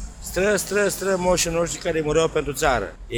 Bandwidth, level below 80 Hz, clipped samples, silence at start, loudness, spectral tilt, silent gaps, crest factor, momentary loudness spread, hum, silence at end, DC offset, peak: over 20 kHz; -38 dBFS; under 0.1%; 0 s; -22 LUFS; -3.5 dB/octave; none; 16 dB; 4 LU; none; 0 s; under 0.1%; -6 dBFS